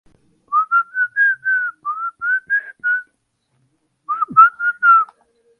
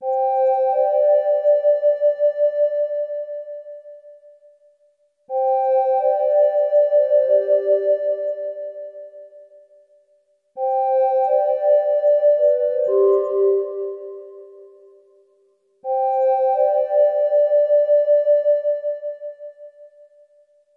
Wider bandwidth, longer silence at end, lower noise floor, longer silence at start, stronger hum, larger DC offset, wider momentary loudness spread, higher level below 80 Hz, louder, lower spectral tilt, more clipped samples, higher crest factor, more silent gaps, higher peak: first, 3.5 kHz vs 3.1 kHz; second, 0.55 s vs 0.9 s; first, -67 dBFS vs -62 dBFS; first, 0.5 s vs 0 s; neither; neither; second, 12 LU vs 16 LU; first, -72 dBFS vs -90 dBFS; about the same, -16 LUFS vs -18 LUFS; second, -4.5 dB/octave vs -6 dB/octave; neither; about the same, 18 dB vs 14 dB; neither; first, 0 dBFS vs -6 dBFS